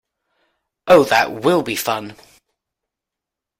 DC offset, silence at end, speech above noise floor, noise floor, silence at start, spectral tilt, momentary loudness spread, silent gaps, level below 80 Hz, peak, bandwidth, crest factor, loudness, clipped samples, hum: under 0.1%; 1.45 s; 69 dB; -85 dBFS; 0.85 s; -4 dB/octave; 18 LU; none; -56 dBFS; 0 dBFS; 16.5 kHz; 20 dB; -16 LUFS; under 0.1%; none